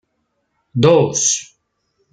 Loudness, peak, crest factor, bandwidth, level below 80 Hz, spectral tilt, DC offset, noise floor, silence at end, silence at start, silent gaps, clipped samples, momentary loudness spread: -15 LUFS; -2 dBFS; 16 dB; 10 kHz; -56 dBFS; -4 dB/octave; under 0.1%; -70 dBFS; 0.7 s; 0.75 s; none; under 0.1%; 10 LU